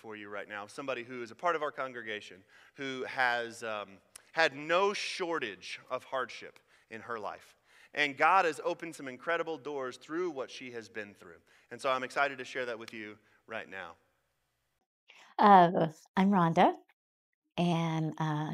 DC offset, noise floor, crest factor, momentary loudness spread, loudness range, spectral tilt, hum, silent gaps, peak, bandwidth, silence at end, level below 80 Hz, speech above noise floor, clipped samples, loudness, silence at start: under 0.1%; -80 dBFS; 24 dB; 18 LU; 10 LU; -5.5 dB/octave; none; 14.86-15.07 s, 16.08-16.14 s, 16.93-17.42 s; -10 dBFS; 13.5 kHz; 0 s; -78 dBFS; 48 dB; under 0.1%; -31 LUFS; 0.05 s